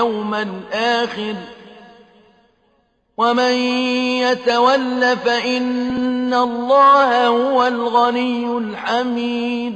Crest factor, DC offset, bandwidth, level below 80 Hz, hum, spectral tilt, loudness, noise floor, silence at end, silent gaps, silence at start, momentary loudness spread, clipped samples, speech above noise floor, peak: 14 dB; under 0.1%; 8.6 kHz; -58 dBFS; none; -4 dB/octave; -17 LUFS; -62 dBFS; 0 s; none; 0 s; 10 LU; under 0.1%; 45 dB; -4 dBFS